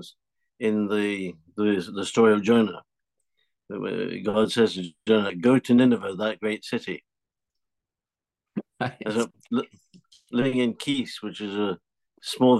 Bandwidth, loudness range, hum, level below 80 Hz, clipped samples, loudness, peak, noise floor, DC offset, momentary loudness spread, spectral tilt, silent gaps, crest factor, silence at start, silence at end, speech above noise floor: 12.5 kHz; 9 LU; none; -68 dBFS; under 0.1%; -25 LUFS; -8 dBFS; under -90 dBFS; under 0.1%; 16 LU; -5.5 dB/octave; none; 18 dB; 0 s; 0 s; over 66 dB